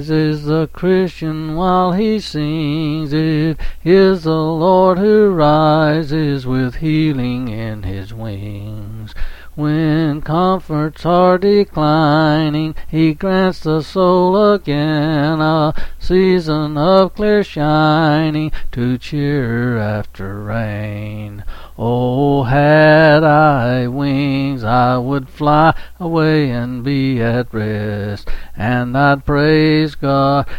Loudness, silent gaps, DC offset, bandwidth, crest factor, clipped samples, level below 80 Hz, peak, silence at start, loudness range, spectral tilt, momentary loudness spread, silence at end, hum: -15 LUFS; none; under 0.1%; 15.5 kHz; 14 dB; under 0.1%; -32 dBFS; 0 dBFS; 0 s; 7 LU; -8 dB/octave; 13 LU; 0 s; none